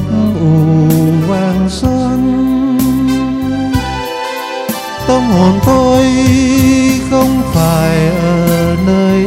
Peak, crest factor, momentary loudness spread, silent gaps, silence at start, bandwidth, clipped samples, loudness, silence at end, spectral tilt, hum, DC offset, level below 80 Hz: 0 dBFS; 10 dB; 9 LU; none; 0 s; 16.5 kHz; under 0.1%; -11 LUFS; 0 s; -6.5 dB/octave; none; under 0.1%; -28 dBFS